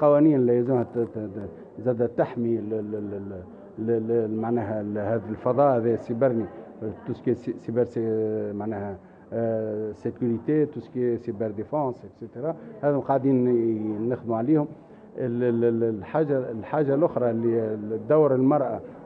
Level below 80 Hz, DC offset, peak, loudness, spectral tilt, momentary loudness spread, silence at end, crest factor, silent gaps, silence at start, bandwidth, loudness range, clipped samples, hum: -66 dBFS; under 0.1%; -8 dBFS; -25 LUFS; -11 dB/octave; 13 LU; 0 s; 18 dB; none; 0 s; 5 kHz; 4 LU; under 0.1%; none